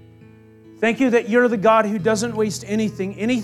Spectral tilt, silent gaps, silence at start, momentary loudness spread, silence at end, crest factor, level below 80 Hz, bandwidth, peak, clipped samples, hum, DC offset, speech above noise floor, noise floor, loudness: -5 dB/octave; none; 0.7 s; 7 LU; 0 s; 16 dB; -60 dBFS; 13.5 kHz; -4 dBFS; under 0.1%; none; under 0.1%; 28 dB; -46 dBFS; -19 LUFS